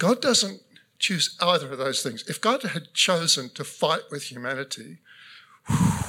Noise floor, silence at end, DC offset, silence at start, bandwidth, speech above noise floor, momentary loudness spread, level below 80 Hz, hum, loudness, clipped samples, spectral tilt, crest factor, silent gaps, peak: -50 dBFS; 0 s; under 0.1%; 0 s; 17.5 kHz; 25 dB; 11 LU; -54 dBFS; none; -24 LUFS; under 0.1%; -3.5 dB/octave; 18 dB; none; -8 dBFS